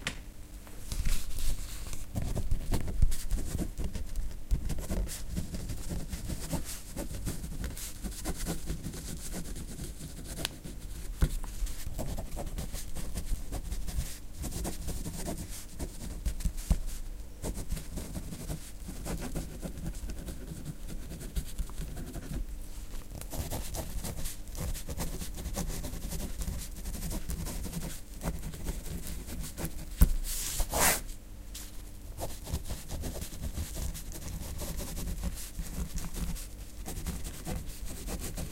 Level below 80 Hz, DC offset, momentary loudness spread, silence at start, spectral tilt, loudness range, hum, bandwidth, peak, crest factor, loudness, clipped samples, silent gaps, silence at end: -36 dBFS; under 0.1%; 8 LU; 0 s; -4 dB/octave; 8 LU; none; 17 kHz; -8 dBFS; 26 dB; -38 LUFS; under 0.1%; none; 0 s